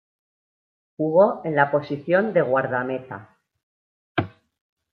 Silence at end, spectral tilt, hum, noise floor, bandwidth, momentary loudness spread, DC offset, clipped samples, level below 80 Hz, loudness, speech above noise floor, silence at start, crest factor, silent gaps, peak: 0.65 s; -9.5 dB/octave; none; under -90 dBFS; 5.2 kHz; 14 LU; under 0.1%; under 0.1%; -68 dBFS; -22 LUFS; over 69 dB; 1 s; 20 dB; 3.63-4.15 s; -4 dBFS